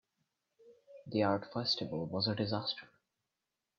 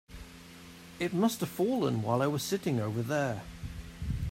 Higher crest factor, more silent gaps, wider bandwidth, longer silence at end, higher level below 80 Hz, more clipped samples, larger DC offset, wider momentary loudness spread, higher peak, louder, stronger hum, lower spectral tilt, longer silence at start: about the same, 20 dB vs 18 dB; neither; second, 7.4 kHz vs 16 kHz; first, 0.95 s vs 0 s; second, -74 dBFS vs -48 dBFS; neither; neither; second, 7 LU vs 20 LU; second, -18 dBFS vs -14 dBFS; second, -35 LUFS vs -32 LUFS; neither; about the same, -6.5 dB/octave vs -6 dB/octave; first, 0.65 s vs 0.1 s